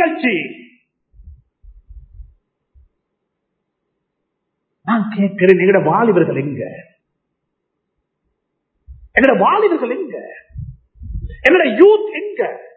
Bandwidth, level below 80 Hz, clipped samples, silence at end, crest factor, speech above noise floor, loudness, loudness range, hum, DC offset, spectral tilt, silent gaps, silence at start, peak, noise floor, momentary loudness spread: 4.8 kHz; -42 dBFS; under 0.1%; 0.1 s; 18 dB; 61 dB; -14 LUFS; 10 LU; none; under 0.1%; -8.5 dB/octave; none; 0 s; 0 dBFS; -74 dBFS; 21 LU